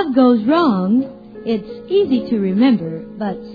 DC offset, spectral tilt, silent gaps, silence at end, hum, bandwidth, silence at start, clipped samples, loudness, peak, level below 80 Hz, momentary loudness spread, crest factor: under 0.1%; -9.5 dB/octave; none; 0 s; none; 5 kHz; 0 s; under 0.1%; -17 LUFS; -2 dBFS; -52 dBFS; 12 LU; 14 dB